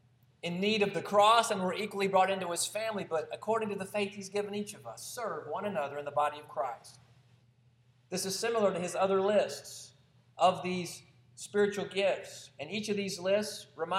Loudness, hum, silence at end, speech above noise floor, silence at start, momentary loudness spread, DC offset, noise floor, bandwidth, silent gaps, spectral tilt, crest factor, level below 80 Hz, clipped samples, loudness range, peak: -32 LUFS; none; 0 s; 34 dB; 0.45 s; 14 LU; under 0.1%; -66 dBFS; 16 kHz; none; -3.5 dB/octave; 22 dB; -78 dBFS; under 0.1%; 7 LU; -10 dBFS